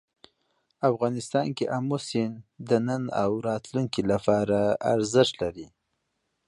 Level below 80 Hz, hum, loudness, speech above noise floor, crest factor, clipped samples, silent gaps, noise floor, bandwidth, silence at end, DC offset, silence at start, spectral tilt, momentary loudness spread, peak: -58 dBFS; none; -26 LUFS; 52 dB; 20 dB; under 0.1%; none; -78 dBFS; 11.5 kHz; 0.8 s; under 0.1%; 0.8 s; -6 dB/octave; 7 LU; -6 dBFS